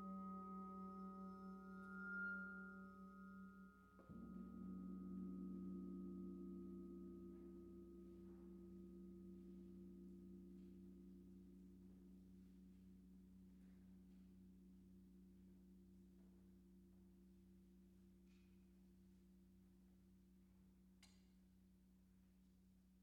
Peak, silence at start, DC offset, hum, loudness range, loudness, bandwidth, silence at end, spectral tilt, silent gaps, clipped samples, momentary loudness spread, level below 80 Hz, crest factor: -42 dBFS; 0 s; under 0.1%; none; 14 LU; -58 LUFS; 6.6 kHz; 0 s; -8 dB/octave; none; under 0.1%; 15 LU; -74 dBFS; 16 dB